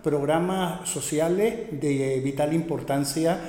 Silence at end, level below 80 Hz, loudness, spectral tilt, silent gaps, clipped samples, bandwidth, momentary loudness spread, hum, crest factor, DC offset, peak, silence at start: 0 s; -54 dBFS; -25 LUFS; -5.5 dB/octave; none; under 0.1%; 17 kHz; 4 LU; none; 14 dB; under 0.1%; -10 dBFS; 0 s